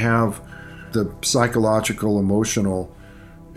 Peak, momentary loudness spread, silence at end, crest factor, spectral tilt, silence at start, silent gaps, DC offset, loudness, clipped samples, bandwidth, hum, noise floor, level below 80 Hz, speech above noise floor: -2 dBFS; 17 LU; 0 s; 18 dB; -5 dB/octave; 0 s; none; under 0.1%; -21 LUFS; under 0.1%; 15 kHz; none; -42 dBFS; -44 dBFS; 22 dB